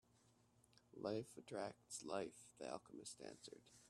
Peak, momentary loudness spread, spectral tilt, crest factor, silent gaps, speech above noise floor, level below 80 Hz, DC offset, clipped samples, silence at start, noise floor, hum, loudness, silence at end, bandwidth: -30 dBFS; 10 LU; -4 dB/octave; 22 dB; none; 25 dB; -86 dBFS; under 0.1%; under 0.1%; 0.3 s; -76 dBFS; none; -52 LUFS; 0 s; 13.5 kHz